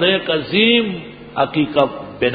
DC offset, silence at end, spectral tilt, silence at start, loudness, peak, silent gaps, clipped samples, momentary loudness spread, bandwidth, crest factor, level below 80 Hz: under 0.1%; 0 s; -8 dB/octave; 0 s; -17 LUFS; 0 dBFS; none; under 0.1%; 12 LU; 5 kHz; 18 dB; -50 dBFS